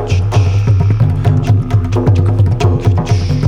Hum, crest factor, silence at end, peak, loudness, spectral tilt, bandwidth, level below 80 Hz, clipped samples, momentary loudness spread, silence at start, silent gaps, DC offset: none; 10 dB; 0 s; 0 dBFS; -12 LUFS; -8 dB/octave; 7.2 kHz; -26 dBFS; under 0.1%; 2 LU; 0 s; none; under 0.1%